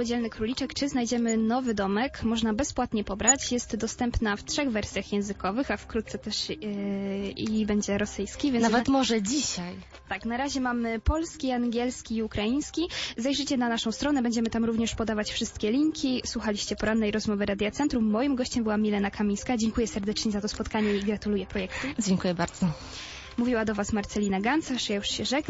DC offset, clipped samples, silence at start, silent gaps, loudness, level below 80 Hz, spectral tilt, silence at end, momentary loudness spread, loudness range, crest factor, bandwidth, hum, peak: under 0.1%; under 0.1%; 0 s; none; -28 LUFS; -44 dBFS; -4 dB/octave; 0 s; 6 LU; 3 LU; 20 dB; 8 kHz; none; -8 dBFS